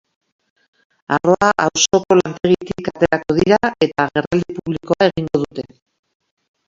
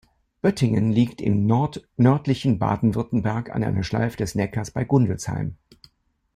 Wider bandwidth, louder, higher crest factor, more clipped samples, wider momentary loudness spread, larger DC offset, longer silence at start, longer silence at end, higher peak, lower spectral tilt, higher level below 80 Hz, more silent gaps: second, 7.8 kHz vs 14 kHz; first, -17 LUFS vs -23 LUFS; about the same, 18 dB vs 16 dB; neither; first, 10 LU vs 7 LU; neither; first, 1.1 s vs 0.45 s; first, 1.05 s vs 0.8 s; first, 0 dBFS vs -6 dBFS; second, -4.5 dB/octave vs -7.5 dB/octave; about the same, -48 dBFS vs -48 dBFS; first, 4.27-4.31 s vs none